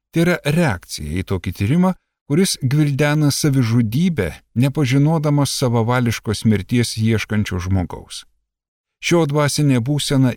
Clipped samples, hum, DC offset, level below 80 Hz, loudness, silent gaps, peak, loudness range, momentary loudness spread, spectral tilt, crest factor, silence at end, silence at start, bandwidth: under 0.1%; none; under 0.1%; -42 dBFS; -18 LUFS; 2.21-2.26 s, 8.68-8.84 s; -4 dBFS; 3 LU; 8 LU; -5.5 dB/octave; 12 dB; 0 s; 0.15 s; 17 kHz